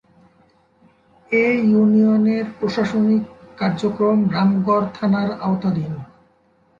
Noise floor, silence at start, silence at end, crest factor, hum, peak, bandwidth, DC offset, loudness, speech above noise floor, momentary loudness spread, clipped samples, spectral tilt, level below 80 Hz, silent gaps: -58 dBFS; 1.3 s; 0.75 s; 14 dB; none; -6 dBFS; 7.2 kHz; under 0.1%; -18 LUFS; 41 dB; 9 LU; under 0.1%; -8.5 dB/octave; -56 dBFS; none